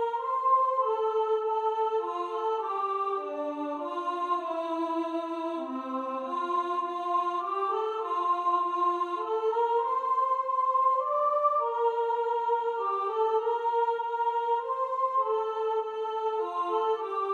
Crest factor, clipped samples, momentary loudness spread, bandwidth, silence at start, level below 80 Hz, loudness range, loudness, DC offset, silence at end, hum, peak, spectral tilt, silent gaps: 14 dB; under 0.1%; 7 LU; 8.4 kHz; 0 s; -84 dBFS; 4 LU; -29 LUFS; under 0.1%; 0 s; none; -14 dBFS; -3.5 dB/octave; none